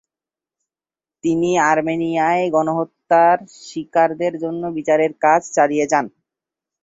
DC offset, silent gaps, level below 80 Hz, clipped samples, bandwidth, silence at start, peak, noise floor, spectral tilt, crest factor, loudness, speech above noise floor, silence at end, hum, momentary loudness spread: under 0.1%; none; -62 dBFS; under 0.1%; 8 kHz; 1.25 s; -2 dBFS; under -90 dBFS; -5.5 dB/octave; 16 dB; -18 LUFS; over 73 dB; 0.75 s; none; 9 LU